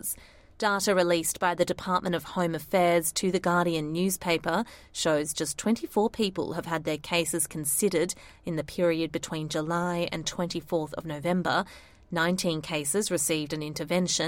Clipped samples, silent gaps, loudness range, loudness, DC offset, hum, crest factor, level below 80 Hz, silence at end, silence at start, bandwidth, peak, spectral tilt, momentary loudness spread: under 0.1%; none; 3 LU; -28 LUFS; under 0.1%; none; 18 dB; -56 dBFS; 0 s; 0.05 s; 16.5 kHz; -10 dBFS; -4 dB/octave; 8 LU